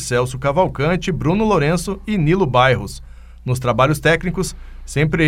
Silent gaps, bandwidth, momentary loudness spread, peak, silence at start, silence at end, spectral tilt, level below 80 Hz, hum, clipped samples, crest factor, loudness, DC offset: none; 15.5 kHz; 11 LU; 0 dBFS; 0 s; 0 s; -6 dB/octave; -34 dBFS; none; under 0.1%; 16 dB; -18 LUFS; under 0.1%